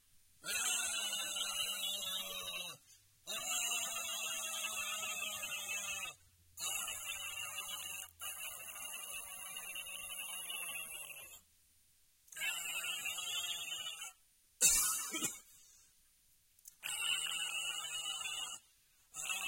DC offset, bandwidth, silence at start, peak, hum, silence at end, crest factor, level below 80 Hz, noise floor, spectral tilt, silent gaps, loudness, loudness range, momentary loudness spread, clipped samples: under 0.1%; 16.5 kHz; 0.15 s; -16 dBFS; none; 0 s; 26 dB; -72 dBFS; -71 dBFS; 2 dB/octave; none; -38 LUFS; 8 LU; 12 LU; under 0.1%